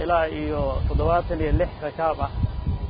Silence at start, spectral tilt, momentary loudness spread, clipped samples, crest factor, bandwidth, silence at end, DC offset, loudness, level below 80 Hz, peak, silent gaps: 0 s; -12 dB/octave; 5 LU; under 0.1%; 14 dB; 5.2 kHz; 0 s; under 0.1%; -25 LUFS; -28 dBFS; -8 dBFS; none